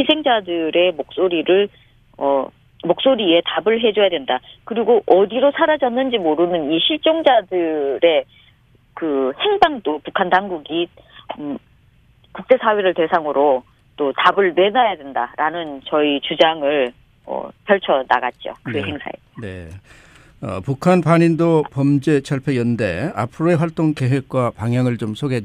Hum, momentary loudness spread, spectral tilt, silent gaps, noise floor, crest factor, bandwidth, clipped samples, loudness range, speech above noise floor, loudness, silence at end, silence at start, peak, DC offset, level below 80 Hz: none; 13 LU; -6.5 dB/octave; none; -53 dBFS; 18 dB; 11 kHz; under 0.1%; 5 LU; 36 dB; -18 LUFS; 0 s; 0 s; 0 dBFS; under 0.1%; -54 dBFS